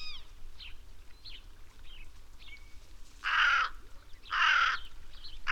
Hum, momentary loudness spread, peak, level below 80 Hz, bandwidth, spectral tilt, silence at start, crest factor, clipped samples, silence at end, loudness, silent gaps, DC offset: none; 26 LU; -14 dBFS; -48 dBFS; 14 kHz; 0 dB/octave; 0 s; 20 dB; under 0.1%; 0 s; -28 LUFS; none; 0.1%